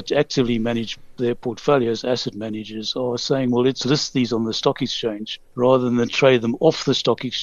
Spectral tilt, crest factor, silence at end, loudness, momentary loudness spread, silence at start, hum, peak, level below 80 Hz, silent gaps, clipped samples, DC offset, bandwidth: -5 dB/octave; 18 dB; 0 s; -21 LUFS; 9 LU; 0 s; none; -2 dBFS; -50 dBFS; none; under 0.1%; under 0.1%; 7.8 kHz